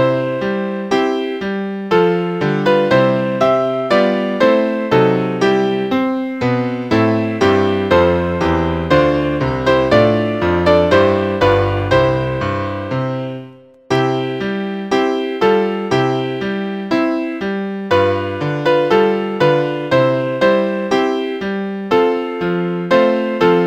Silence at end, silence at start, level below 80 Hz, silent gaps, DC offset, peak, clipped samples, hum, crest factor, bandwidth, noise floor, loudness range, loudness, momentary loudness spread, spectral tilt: 0 s; 0 s; -40 dBFS; none; under 0.1%; 0 dBFS; under 0.1%; none; 16 dB; 9.4 kHz; -38 dBFS; 4 LU; -16 LUFS; 8 LU; -7 dB/octave